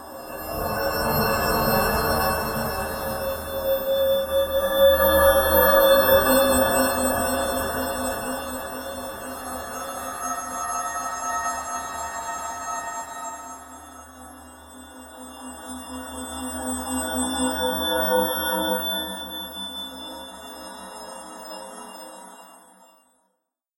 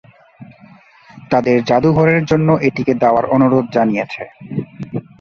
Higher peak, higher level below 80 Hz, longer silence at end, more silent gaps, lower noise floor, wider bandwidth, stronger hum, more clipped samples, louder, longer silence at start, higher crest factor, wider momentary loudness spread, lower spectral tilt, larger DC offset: second, -4 dBFS vs 0 dBFS; first, -42 dBFS vs -48 dBFS; first, 1.2 s vs 0.2 s; neither; first, -77 dBFS vs -44 dBFS; first, 16.5 kHz vs 7 kHz; neither; neither; second, -23 LUFS vs -15 LUFS; second, 0 s vs 0.4 s; about the same, 20 dB vs 16 dB; first, 22 LU vs 13 LU; second, -3 dB/octave vs -8 dB/octave; neither